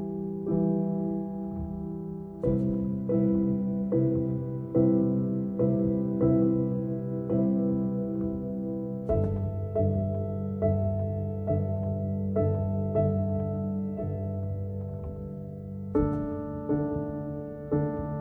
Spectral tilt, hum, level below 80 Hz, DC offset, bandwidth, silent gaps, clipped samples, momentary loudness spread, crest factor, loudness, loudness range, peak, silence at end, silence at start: -13 dB/octave; none; -48 dBFS; under 0.1%; 2.7 kHz; none; under 0.1%; 9 LU; 16 dB; -29 LUFS; 5 LU; -12 dBFS; 0 s; 0 s